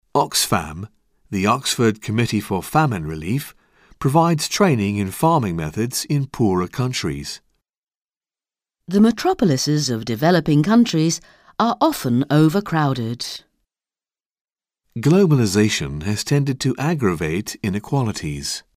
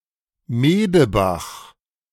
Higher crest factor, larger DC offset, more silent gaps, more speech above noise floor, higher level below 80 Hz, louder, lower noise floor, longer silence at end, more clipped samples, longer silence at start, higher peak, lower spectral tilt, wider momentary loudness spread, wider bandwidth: about the same, 18 dB vs 16 dB; neither; first, 7.78-7.87 s, 14.26-14.30 s, 14.41-14.45 s vs none; first, over 71 dB vs 33 dB; second, -48 dBFS vs -42 dBFS; about the same, -19 LUFS vs -18 LUFS; first, under -90 dBFS vs -50 dBFS; second, 0.15 s vs 0.5 s; neither; second, 0.15 s vs 0.5 s; about the same, -2 dBFS vs -4 dBFS; about the same, -5.5 dB/octave vs -6.5 dB/octave; second, 10 LU vs 17 LU; about the same, 16 kHz vs 17 kHz